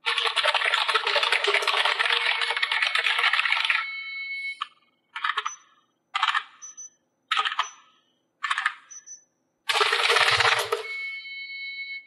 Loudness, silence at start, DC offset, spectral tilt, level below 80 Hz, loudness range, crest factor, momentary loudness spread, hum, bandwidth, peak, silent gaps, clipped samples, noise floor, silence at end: -23 LUFS; 0.05 s; under 0.1%; 0.5 dB/octave; -72 dBFS; 8 LU; 22 dB; 16 LU; none; 13.5 kHz; -6 dBFS; none; under 0.1%; -68 dBFS; 0.05 s